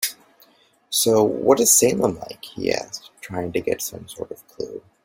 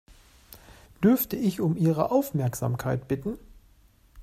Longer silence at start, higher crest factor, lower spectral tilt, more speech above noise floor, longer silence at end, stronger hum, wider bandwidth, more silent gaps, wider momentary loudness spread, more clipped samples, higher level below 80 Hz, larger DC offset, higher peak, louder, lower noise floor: second, 0 s vs 0.5 s; about the same, 20 dB vs 18 dB; second, -3 dB/octave vs -7.5 dB/octave; about the same, 36 dB vs 33 dB; first, 0.25 s vs 0 s; neither; about the same, 16.5 kHz vs 15.5 kHz; neither; first, 20 LU vs 9 LU; neither; about the same, -58 dBFS vs -54 dBFS; neither; first, -2 dBFS vs -8 dBFS; first, -19 LUFS vs -26 LUFS; about the same, -57 dBFS vs -58 dBFS